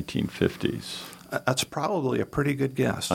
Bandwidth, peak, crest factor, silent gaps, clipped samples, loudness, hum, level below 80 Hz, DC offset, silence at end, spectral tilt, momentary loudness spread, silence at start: 17 kHz; -8 dBFS; 20 dB; none; under 0.1%; -28 LUFS; none; -52 dBFS; under 0.1%; 0 s; -5 dB/octave; 8 LU; 0 s